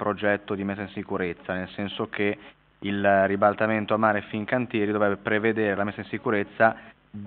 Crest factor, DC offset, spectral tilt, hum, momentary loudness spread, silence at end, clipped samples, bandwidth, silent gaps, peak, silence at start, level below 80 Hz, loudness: 20 dB; under 0.1%; -4.5 dB/octave; none; 10 LU; 0 s; under 0.1%; 4.5 kHz; none; -4 dBFS; 0 s; -64 dBFS; -25 LUFS